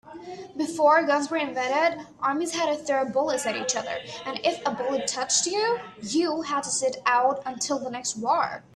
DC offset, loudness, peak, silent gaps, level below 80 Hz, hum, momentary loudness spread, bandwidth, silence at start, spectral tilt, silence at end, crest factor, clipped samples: under 0.1%; -25 LUFS; -8 dBFS; none; -68 dBFS; none; 9 LU; 13 kHz; 0.05 s; -2 dB/octave; 0.15 s; 18 dB; under 0.1%